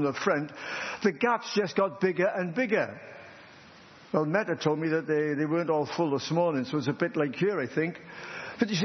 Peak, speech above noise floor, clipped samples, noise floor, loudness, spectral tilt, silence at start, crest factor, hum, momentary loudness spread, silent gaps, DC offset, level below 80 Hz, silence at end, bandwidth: -10 dBFS; 24 dB; under 0.1%; -52 dBFS; -29 LUFS; -6 dB/octave; 0 s; 18 dB; none; 9 LU; none; under 0.1%; -76 dBFS; 0 s; 6.4 kHz